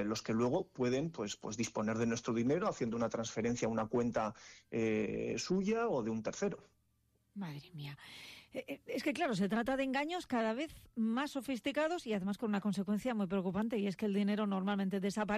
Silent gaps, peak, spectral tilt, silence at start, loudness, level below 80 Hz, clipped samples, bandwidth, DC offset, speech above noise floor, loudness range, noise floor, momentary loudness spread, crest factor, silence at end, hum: none; -26 dBFS; -5.5 dB/octave; 0 s; -36 LUFS; -66 dBFS; under 0.1%; 14 kHz; under 0.1%; 40 dB; 4 LU; -76 dBFS; 12 LU; 12 dB; 0 s; none